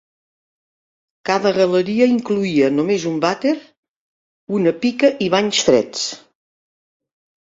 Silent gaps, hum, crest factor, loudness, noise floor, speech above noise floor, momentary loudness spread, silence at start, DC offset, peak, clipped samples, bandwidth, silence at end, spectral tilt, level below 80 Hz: 3.77-3.83 s, 3.89-4.47 s; none; 18 dB; -17 LUFS; under -90 dBFS; over 73 dB; 9 LU; 1.25 s; under 0.1%; 0 dBFS; under 0.1%; 7.8 kHz; 1.4 s; -4.5 dB/octave; -60 dBFS